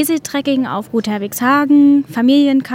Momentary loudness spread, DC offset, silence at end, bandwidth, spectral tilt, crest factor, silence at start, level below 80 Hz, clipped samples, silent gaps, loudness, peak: 9 LU; under 0.1%; 0 s; 16.5 kHz; -4.5 dB/octave; 12 dB; 0 s; -60 dBFS; under 0.1%; none; -14 LUFS; -2 dBFS